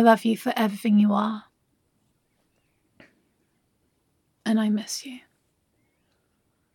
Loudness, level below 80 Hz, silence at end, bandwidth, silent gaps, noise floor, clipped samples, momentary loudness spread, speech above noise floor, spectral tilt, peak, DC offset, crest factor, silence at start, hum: -24 LUFS; -80 dBFS; 1.55 s; 16.5 kHz; none; -71 dBFS; under 0.1%; 16 LU; 49 dB; -5.5 dB/octave; -2 dBFS; under 0.1%; 24 dB; 0 s; none